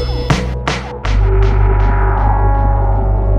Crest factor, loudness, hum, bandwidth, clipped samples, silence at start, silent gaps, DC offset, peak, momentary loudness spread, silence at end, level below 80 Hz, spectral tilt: 12 dB; -15 LUFS; none; 7.8 kHz; under 0.1%; 0 s; none; under 0.1%; 0 dBFS; 5 LU; 0 s; -14 dBFS; -6.5 dB/octave